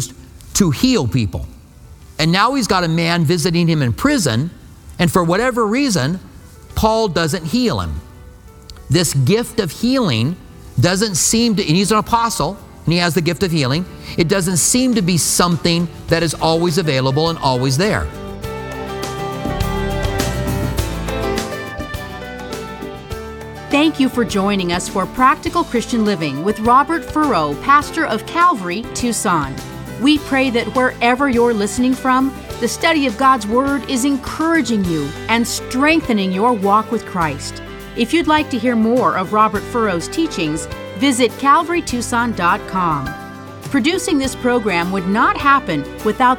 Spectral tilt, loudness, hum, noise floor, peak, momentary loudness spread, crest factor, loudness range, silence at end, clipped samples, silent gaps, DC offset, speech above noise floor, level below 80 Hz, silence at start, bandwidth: -4.5 dB/octave; -16 LUFS; none; -40 dBFS; 0 dBFS; 12 LU; 16 dB; 4 LU; 0 s; under 0.1%; none; under 0.1%; 24 dB; -36 dBFS; 0 s; 19 kHz